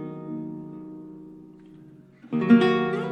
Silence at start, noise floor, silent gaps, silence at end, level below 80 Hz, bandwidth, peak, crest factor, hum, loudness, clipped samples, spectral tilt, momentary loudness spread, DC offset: 0 s; -49 dBFS; none; 0 s; -66 dBFS; 8 kHz; -6 dBFS; 20 dB; none; -23 LUFS; under 0.1%; -8 dB/octave; 25 LU; under 0.1%